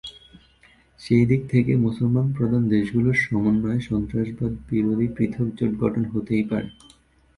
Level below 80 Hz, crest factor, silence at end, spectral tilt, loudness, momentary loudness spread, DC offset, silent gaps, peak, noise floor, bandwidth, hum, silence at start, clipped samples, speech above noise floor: -46 dBFS; 16 dB; 0.65 s; -8.5 dB/octave; -22 LUFS; 7 LU; under 0.1%; none; -6 dBFS; -56 dBFS; 11 kHz; none; 0.05 s; under 0.1%; 35 dB